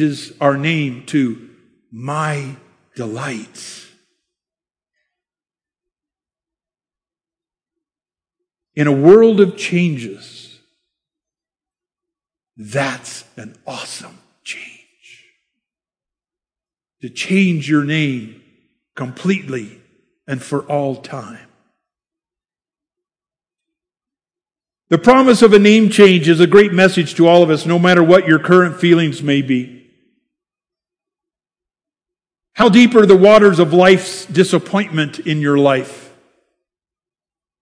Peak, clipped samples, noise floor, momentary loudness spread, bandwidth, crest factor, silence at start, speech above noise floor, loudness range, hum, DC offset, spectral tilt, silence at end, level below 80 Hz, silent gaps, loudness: 0 dBFS; 0.4%; under -90 dBFS; 22 LU; 11 kHz; 16 dB; 0 s; over 77 dB; 18 LU; none; under 0.1%; -6 dB/octave; 1.65 s; -56 dBFS; none; -12 LUFS